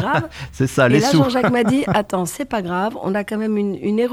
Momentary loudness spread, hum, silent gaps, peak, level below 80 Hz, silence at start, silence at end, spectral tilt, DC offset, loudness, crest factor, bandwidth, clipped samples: 8 LU; none; none; -2 dBFS; -48 dBFS; 0 s; 0 s; -6 dB/octave; under 0.1%; -18 LUFS; 16 dB; 19.5 kHz; under 0.1%